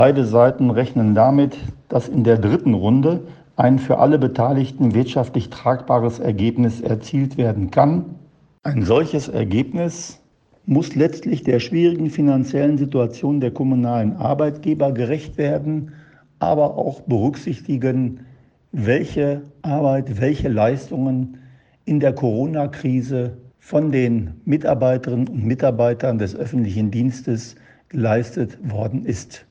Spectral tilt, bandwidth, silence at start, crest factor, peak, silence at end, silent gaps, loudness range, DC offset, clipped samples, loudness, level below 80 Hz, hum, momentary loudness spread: -8 dB/octave; 8.2 kHz; 0 s; 18 dB; 0 dBFS; 0.1 s; none; 5 LU; under 0.1%; under 0.1%; -19 LUFS; -48 dBFS; none; 10 LU